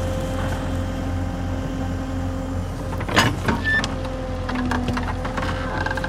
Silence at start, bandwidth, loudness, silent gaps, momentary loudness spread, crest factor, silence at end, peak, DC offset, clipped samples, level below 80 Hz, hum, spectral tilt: 0 s; 16 kHz; -24 LUFS; none; 8 LU; 22 dB; 0 s; -2 dBFS; under 0.1%; under 0.1%; -32 dBFS; none; -5.5 dB/octave